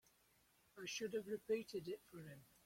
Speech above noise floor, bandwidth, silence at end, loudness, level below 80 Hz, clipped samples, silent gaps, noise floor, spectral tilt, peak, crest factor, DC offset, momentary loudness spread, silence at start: 29 dB; 16.5 kHz; 0.2 s; -47 LUFS; -82 dBFS; under 0.1%; none; -76 dBFS; -4 dB/octave; -32 dBFS; 18 dB; under 0.1%; 14 LU; 0.75 s